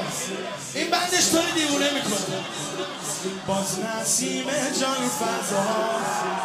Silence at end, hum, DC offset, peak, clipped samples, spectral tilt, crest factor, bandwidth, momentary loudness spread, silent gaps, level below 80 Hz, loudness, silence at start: 0 s; none; under 0.1%; -8 dBFS; under 0.1%; -2.5 dB/octave; 18 dB; 16 kHz; 10 LU; none; -66 dBFS; -24 LUFS; 0 s